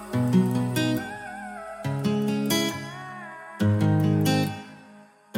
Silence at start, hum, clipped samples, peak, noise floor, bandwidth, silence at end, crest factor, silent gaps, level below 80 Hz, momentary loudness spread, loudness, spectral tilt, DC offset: 0 s; none; under 0.1%; -10 dBFS; -51 dBFS; 16.5 kHz; 0 s; 16 dB; none; -62 dBFS; 16 LU; -25 LUFS; -6 dB/octave; under 0.1%